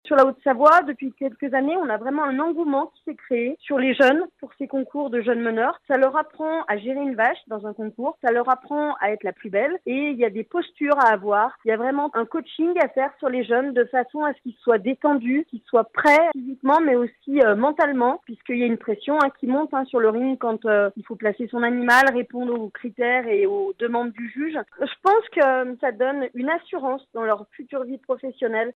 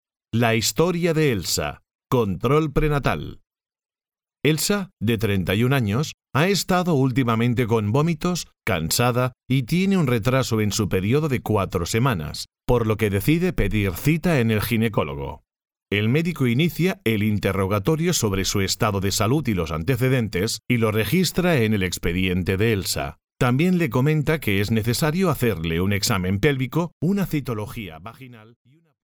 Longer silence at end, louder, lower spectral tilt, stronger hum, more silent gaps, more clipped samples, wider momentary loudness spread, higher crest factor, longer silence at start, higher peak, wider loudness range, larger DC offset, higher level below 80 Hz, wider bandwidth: second, 0.05 s vs 0.65 s; about the same, -22 LUFS vs -22 LUFS; about the same, -5.5 dB/octave vs -5.5 dB/octave; neither; second, none vs 1.95-1.99 s, 6.14-6.18 s, 26.92-27.00 s; neither; first, 11 LU vs 6 LU; about the same, 20 dB vs 18 dB; second, 0.05 s vs 0.35 s; about the same, -2 dBFS vs -4 dBFS; about the same, 4 LU vs 2 LU; neither; second, -72 dBFS vs -40 dBFS; second, 13.5 kHz vs over 20 kHz